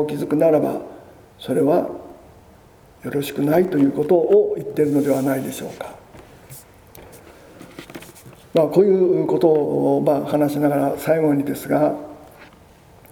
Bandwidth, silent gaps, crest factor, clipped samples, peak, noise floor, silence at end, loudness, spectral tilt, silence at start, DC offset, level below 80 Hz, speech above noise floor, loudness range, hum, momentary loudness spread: over 20 kHz; none; 18 dB; under 0.1%; -2 dBFS; -48 dBFS; 0.7 s; -19 LUFS; -7 dB/octave; 0 s; under 0.1%; -56 dBFS; 30 dB; 7 LU; none; 21 LU